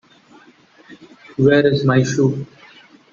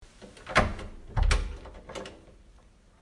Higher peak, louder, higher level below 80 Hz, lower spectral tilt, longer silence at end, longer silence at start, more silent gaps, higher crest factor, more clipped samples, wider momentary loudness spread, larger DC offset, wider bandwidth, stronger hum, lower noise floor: first, -2 dBFS vs -8 dBFS; first, -16 LUFS vs -30 LUFS; second, -54 dBFS vs -34 dBFS; first, -6.5 dB/octave vs -4.5 dB/octave; about the same, 0.65 s vs 0.7 s; first, 0.9 s vs 0 s; neither; second, 16 dB vs 24 dB; neither; about the same, 17 LU vs 19 LU; neither; second, 7.6 kHz vs 11.5 kHz; neither; second, -49 dBFS vs -57 dBFS